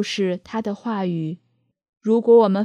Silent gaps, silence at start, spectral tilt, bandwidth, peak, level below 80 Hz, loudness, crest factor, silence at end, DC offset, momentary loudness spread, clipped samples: 1.89-1.93 s; 0 s; -6.5 dB/octave; 9.8 kHz; -4 dBFS; -68 dBFS; -21 LUFS; 16 dB; 0 s; under 0.1%; 15 LU; under 0.1%